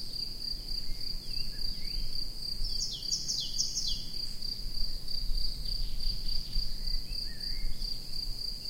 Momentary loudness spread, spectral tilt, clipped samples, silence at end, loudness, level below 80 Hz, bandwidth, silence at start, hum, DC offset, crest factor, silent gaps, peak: 6 LU; -1.5 dB/octave; under 0.1%; 0 s; -35 LUFS; -36 dBFS; 16 kHz; 0 s; none; under 0.1%; 16 dB; none; -16 dBFS